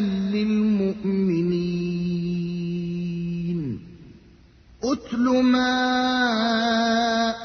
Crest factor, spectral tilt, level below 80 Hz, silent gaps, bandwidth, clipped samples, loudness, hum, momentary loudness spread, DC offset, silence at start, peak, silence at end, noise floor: 14 dB; -6 dB/octave; -52 dBFS; none; 6.6 kHz; under 0.1%; -23 LUFS; none; 8 LU; under 0.1%; 0 s; -10 dBFS; 0 s; -51 dBFS